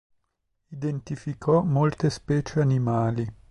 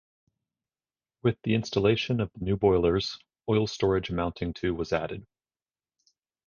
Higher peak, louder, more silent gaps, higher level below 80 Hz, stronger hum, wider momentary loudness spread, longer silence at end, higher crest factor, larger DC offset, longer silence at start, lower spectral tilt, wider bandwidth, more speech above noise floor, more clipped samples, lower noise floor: about the same, -10 dBFS vs -10 dBFS; first, -25 LUFS vs -28 LUFS; neither; about the same, -52 dBFS vs -48 dBFS; neither; about the same, 10 LU vs 8 LU; second, 0.2 s vs 1.2 s; about the same, 16 dB vs 20 dB; neither; second, 0.7 s vs 1.25 s; first, -8 dB/octave vs -6.5 dB/octave; first, 10.5 kHz vs 7.2 kHz; second, 51 dB vs over 63 dB; neither; second, -76 dBFS vs under -90 dBFS